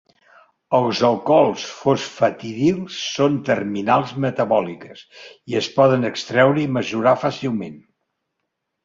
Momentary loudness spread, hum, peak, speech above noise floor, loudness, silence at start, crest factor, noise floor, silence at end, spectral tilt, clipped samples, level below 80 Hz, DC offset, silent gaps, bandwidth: 10 LU; none; -2 dBFS; 58 dB; -19 LUFS; 0.7 s; 18 dB; -77 dBFS; 1.05 s; -5.5 dB/octave; under 0.1%; -60 dBFS; under 0.1%; none; 7.6 kHz